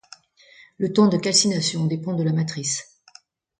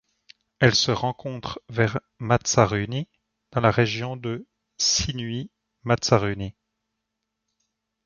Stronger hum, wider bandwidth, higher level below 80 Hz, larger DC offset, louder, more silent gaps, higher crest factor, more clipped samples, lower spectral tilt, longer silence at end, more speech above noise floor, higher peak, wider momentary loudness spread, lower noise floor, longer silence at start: neither; first, 9.6 kHz vs 7.4 kHz; second, -64 dBFS vs -48 dBFS; neither; first, -21 LUFS vs -24 LUFS; neither; about the same, 20 dB vs 24 dB; neither; about the same, -4.5 dB/octave vs -4 dB/octave; second, 0.75 s vs 1.55 s; second, 33 dB vs 58 dB; about the same, -4 dBFS vs -2 dBFS; second, 9 LU vs 14 LU; second, -54 dBFS vs -81 dBFS; first, 0.8 s vs 0.6 s